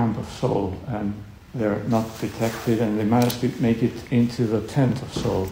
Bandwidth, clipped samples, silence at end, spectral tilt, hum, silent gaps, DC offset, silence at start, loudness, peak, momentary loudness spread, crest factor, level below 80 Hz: 16 kHz; under 0.1%; 0 s; -7 dB/octave; none; none; under 0.1%; 0 s; -24 LUFS; -8 dBFS; 8 LU; 14 dB; -46 dBFS